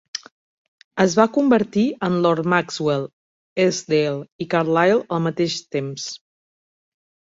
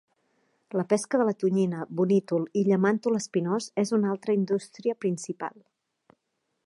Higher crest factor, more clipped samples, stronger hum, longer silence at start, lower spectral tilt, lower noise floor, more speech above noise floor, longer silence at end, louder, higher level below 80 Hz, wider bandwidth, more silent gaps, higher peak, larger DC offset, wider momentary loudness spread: about the same, 18 dB vs 18 dB; neither; neither; second, 0.15 s vs 0.75 s; about the same, -5.5 dB/octave vs -6.5 dB/octave; first, under -90 dBFS vs -79 dBFS; first, over 71 dB vs 53 dB; about the same, 1.2 s vs 1.15 s; first, -20 LUFS vs -27 LUFS; first, -62 dBFS vs -78 dBFS; second, 7.8 kHz vs 11.5 kHz; first, 0.32-0.78 s, 0.84-0.91 s, 3.13-3.56 s, 4.32-4.39 s vs none; first, -2 dBFS vs -8 dBFS; neither; first, 14 LU vs 8 LU